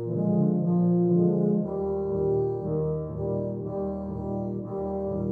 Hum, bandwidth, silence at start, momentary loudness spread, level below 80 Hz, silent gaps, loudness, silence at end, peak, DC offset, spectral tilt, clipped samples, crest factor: none; 1.7 kHz; 0 s; 9 LU; -48 dBFS; none; -27 LUFS; 0 s; -12 dBFS; under 0.1%; -14 dB/octave; under 0.1%; 14 dB